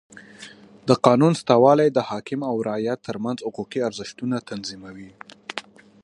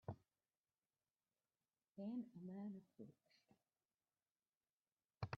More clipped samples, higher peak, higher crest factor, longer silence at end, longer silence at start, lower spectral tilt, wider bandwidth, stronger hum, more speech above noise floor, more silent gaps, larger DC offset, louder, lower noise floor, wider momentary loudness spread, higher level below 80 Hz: neither; first, 0 dBFS vs -34 dBFS; about the same, 22 dB vs 24 dB; first, 0.4 s vs 0 s; about the same, 0.15 s vs 0.05 s; about the same, -6.5 dB/octave vs -7 dB/octave; first, 11.5 kHz vs 6.4 kHz; neither; second, 23 dB vs over 37 dB; second, none vs 0.57-0.64 s, 3.94-3.98 s, 4.57-4.61 s, 4.72-4.78 s, 4.92-4.97 s; neither; first, -22 LUFS vs -55 LUFS; second, -45 dBFS vs under -90 dBFS; first, 25 LU vs 14 LU; first, -64 dBFS vs -82 dBFS